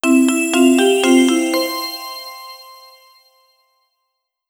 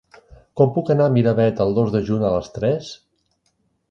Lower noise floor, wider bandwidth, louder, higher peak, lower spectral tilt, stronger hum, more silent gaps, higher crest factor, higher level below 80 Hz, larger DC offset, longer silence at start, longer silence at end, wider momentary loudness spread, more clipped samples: first, -75 dBFS vs -67 dBFS; first, over 20 kHz vs 7.4 kHz; first, -14 LUFS vs -19 LUFS; about the same, 0 dBFS vs -2 dBFS; second, -1.5 dB/octave vs -8.5 dB/octave; neither; neither; about the same, 16 dB vs 18 dB; second, -74 dBFS vs -48 dBFS; neither; second, 0.05 s vs 0.55 s; first, 1.85 s vs 0.95 s; first, 21 LU vs 8 LU; neither